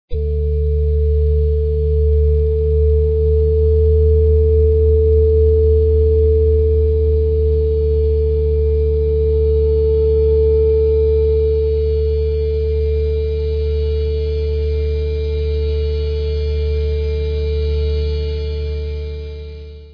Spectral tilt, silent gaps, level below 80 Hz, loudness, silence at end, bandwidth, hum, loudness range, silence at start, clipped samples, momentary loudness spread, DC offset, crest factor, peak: -10.5 dB/octave; none; -18 dBFS; -16 LUFS; 0 s; 5.2 kHz; 60 Hz at -40 dBFS; 6 LU; 0.1 s; under 0.1%; 7 LU; under 0.1%; 10 dB; -4 dBFS